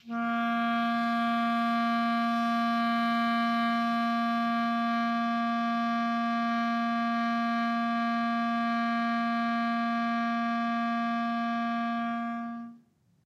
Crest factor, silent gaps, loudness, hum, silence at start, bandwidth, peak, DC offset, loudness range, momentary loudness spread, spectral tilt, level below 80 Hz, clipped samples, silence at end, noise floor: 10 dB; none; -28 LUFS; none; 0.05 s; 7.2 kHz; -20 dBFS; under 0.1%; 2 LU; 3 LU; -5.5 dB/octave; -84 dBFS; under 0.1%; 0.5 s; -62 dBFS